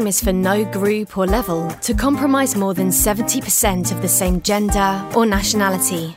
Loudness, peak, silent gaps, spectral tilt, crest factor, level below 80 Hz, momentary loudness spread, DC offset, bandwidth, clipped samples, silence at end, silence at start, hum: -17 LUFS; -4 dBFS; none; -4 dB/octave; 14 dB; -30 dBFS; 4 LU; under 0.1%; 16.5 kHz; under 0.1%; 0 s; 0 s; none